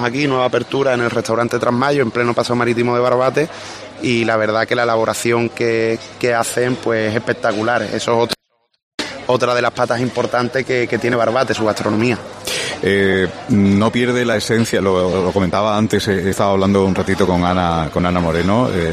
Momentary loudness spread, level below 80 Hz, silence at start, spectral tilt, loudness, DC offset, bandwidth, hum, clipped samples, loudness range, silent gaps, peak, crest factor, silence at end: 4 LU; -44 dBFS; 0 s; -5.5 dB/octave; -16 LUFS; under 0.1%; 14 kHz; none; under 0.1%; 3 LU; 8.83-8.98 s; 0 dBFS; 16 dB; 0 s